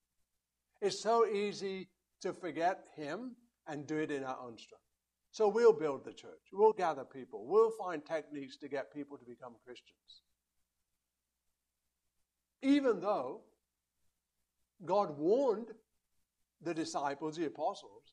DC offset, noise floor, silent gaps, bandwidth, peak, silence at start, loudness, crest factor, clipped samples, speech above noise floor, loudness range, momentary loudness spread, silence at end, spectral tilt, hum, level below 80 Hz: under 0.1%; -88 dBFS; none; 10.5 kHz; -16 dBFS; 0.8 s; -35 LUFS; 22 dB; under 0.1%; 53 dB; 10 LU; 21 LU; 0.25 s; -5 dB/octave; none; -84 dBFS